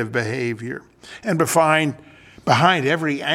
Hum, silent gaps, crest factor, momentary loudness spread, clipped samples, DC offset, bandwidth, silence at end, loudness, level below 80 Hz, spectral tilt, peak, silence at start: none; none; 20 dB; 15 LU; under 0.1%; under 0.1%; 17 kHz; 0 s; -19 LUFS; -60 dBFS; -4.5 dB/octave; 0 dBFS; 0 s